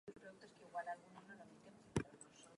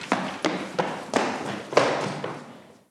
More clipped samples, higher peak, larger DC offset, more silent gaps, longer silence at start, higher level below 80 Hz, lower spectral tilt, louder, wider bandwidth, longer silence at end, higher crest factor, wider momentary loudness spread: neither; second, -24 dBFS vs -2 dBFS; neither; neither; about the same, 0.05 s vs 0 s; about the same, -68 dBFS vs -70 dBFS; first, -5.5 dB/octave vs -4 dB/octave; second, -51 LUFS vs -27 LUFS; second, 11 kHz vs 14 kHz; second, 0 s vs 0.2 s; about the same, 26 dB vs 26 dB; first, 16 LU vs 12 LU